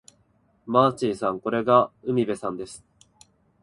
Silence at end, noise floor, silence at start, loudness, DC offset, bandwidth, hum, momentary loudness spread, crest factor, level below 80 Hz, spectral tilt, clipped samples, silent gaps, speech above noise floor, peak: 0.85 s; -64 dBFS; 0.65 s; -23 LUFS; under 0.1%; 11.5 kHz; none; 15 LU; 22 dB; -62 dBFS; -6.5 dB/octave; under 0.1%; none; 41 dB; -4 dBFS